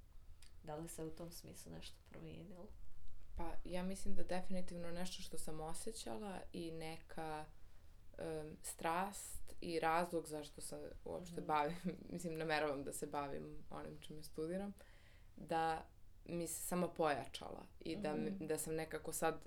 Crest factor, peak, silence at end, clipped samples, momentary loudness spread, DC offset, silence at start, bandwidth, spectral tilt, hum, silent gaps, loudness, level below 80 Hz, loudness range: 20 dB; -22 dBFS; 0 s; under 0.1%; 17 LU; under 0.1%; 0.05 s; 18 kHz; -4.5 dB/octave; none; none; -45 LUFS; -58 dBFS; 7 LU